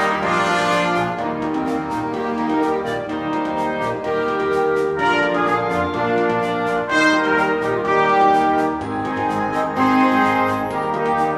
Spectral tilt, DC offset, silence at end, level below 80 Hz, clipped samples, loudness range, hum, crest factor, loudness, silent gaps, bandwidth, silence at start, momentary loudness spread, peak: -5.5 dB/octave; under 0.1%; 0 s; -50 dBFS; under 0.1%; 4 LU; none; 16 dB; -19 LUFS; none; 14 kHz; 0 s; 7 LU; -4 dBFS